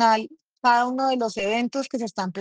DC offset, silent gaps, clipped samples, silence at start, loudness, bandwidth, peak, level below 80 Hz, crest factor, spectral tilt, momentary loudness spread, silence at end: under 0.1%; none; under 0.1%; 0 s; -23 LUFS; 9.8 kHz; -6 dBFS; -68 dBFS; 16 dB; -4 dB/octave; 9 LU; 0 s